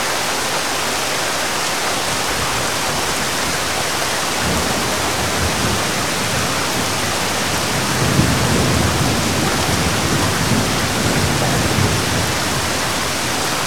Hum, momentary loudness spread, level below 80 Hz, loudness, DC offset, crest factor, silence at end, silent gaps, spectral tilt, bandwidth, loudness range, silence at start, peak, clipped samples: none; 2 LU; -36 dBFS; -17 LUFS; 2%; 18 dB; 0 s; none; -3 dB/octave; 19.5 kHz; 2 LU; 0 s; 0 dBFS; under 0.1%